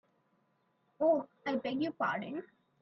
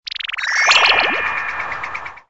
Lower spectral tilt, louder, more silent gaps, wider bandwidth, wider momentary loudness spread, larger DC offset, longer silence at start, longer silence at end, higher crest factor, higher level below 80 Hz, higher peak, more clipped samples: first, -7 dB/octave vs 0.5 dB/octave; second, -34 LUFS vs -15 LUFS; neither; second, 6.2 kHz vs 8 kHz; second, 10 LU vs 14 LU; neither; first, 1 s vs 0.05 s; first, 0.35 s vs 0.1 s; about the same, 18 dB vs 18 dB; second, -80 dBFS vs -52 dBFS; second, -18 dBFS vs 0 dBFS; neither